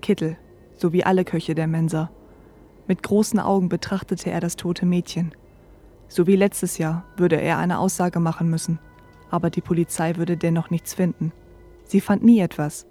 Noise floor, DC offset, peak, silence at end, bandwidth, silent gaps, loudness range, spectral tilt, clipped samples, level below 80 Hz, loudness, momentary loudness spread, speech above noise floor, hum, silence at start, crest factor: -48 dBFS; under 0.1%; -4 dBFS; 0.1 s; 15.5 kHz; none; 2 LU; -6.5 dB/octave; under 0.1%; -52 dBFS; -22 LUFS; 10 LU; 28 dB; none; 0.05 s; 18 dB